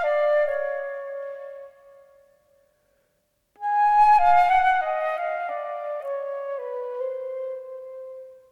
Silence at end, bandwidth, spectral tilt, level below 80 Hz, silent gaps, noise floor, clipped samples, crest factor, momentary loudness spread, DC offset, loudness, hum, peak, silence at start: 0.15 s; 12 kHz; -2.5 dB/octave; -56 dBFS; none; -71 dBFS; under 0.1%; 16 dB; 21 LU; under 0.1%; -23 LUFS; none; -8 dBFS; 0 s